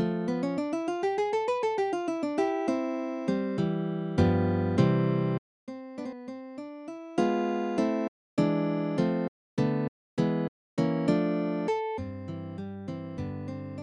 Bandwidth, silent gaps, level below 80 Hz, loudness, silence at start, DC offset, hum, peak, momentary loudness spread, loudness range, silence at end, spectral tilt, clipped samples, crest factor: 10.5 kHz; 5.38-5.67 s, 8.08-8.37 s, 9.28-9.57 s, 9.88-10.17 s, 10.48-10.77 s; -58 dBFS; -29 LUFS; 0 s; under 0.1%; none; -10 dBFS; 13 LU; 3 LU; 0 s; -8 dB/octave; under 0.1%; 20 dB